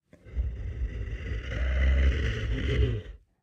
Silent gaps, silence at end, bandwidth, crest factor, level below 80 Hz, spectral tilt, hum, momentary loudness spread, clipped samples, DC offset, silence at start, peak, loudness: none; 0.25 s; 6.6 kHz; 16 dB; -30 dBFS; -7 dB/octave; none; 11 LU; under 0.1%; under 0.1%; 0.25 s; -12 dBFS; -30 LUFS